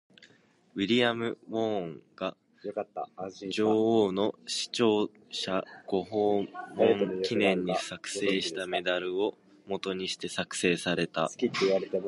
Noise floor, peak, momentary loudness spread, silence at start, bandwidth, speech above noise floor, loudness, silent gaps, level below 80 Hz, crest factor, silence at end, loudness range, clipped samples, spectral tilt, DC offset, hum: -63 dBFS; -10 dBFS; 12 LU; 0.2 s; 11.5 kHz; 33 dB; -30 LUFS; none; -68 dBFS; 20 dB; 0 s; 3 LU; under 0.1%; -4.5 dB/octave; under 0.1%; none